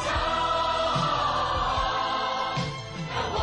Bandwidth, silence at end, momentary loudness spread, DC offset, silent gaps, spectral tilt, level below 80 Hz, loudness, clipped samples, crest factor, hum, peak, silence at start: 10 kHz; 0 s; 6 LU; under 0.1%; none; -4 dB/octave; -42 dBFS; -26 LUFS; under 0.1%; 12 dB; none; -14 dBFS; 0 s